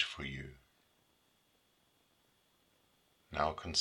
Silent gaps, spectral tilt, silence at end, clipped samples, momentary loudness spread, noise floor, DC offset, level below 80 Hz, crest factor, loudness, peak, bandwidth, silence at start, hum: none; -3 dB/octave; 0 s; under 0.1%; 13 LU; -74 dBFS; under 0.1%; -62 dBFS; 26 dB; -38 LUFS; -16 dBFS; 18 kHz; 0 s; none